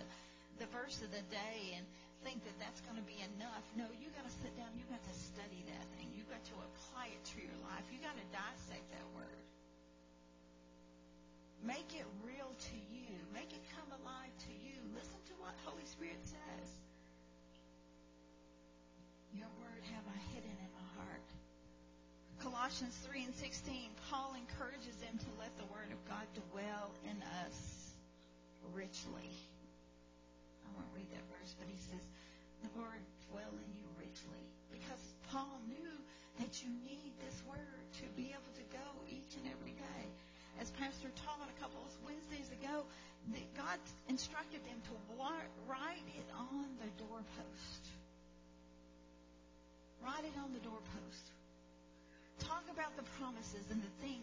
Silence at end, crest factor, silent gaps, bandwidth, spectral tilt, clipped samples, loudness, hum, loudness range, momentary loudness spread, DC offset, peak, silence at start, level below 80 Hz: 0 s; 22 dB; none; 7.8 kHz; -4 dB/octave; under 0.1%; -50 LUFS; 60 Hz at -65 dBFS; 7 LU; 19 LU; under 0.1%; -30 dBFS; 0 s; -66 dBFS